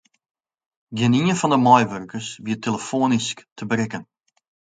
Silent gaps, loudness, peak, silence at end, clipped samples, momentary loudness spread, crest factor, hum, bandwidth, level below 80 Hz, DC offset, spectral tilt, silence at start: 3.52-3.56 s; -21 LUFS; 0 dBFS; 0.75 s; under 0.1%; 16 LU; 22 dB; none; 9.4 kHz; -62 dBFS; under 0.1%; -5 dB/octave; 0.9 s